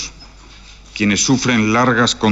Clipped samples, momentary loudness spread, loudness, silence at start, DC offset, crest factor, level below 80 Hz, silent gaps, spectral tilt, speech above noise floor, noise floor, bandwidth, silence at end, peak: under 0.1%; 12 LU; -14 LUFS; 0 s; under 0.1%; 14 dB; -42 dBFS; none; -3.5 dB/octave; 26 dB; -40 dBFS; 8.2 kHz; 0 s; -4 dBFS